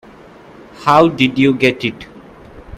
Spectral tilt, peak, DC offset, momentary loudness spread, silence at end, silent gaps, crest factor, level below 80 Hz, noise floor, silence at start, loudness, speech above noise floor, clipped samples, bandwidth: -6 dB/octave; 0 dBFS; under 0.1%; 11 LU; 0 s; none; 16 dB; -48 dBFS; -40 dBFS; 0.75 s; -14 LUFS; 27 dB; under 0.1%; 13.5 kHz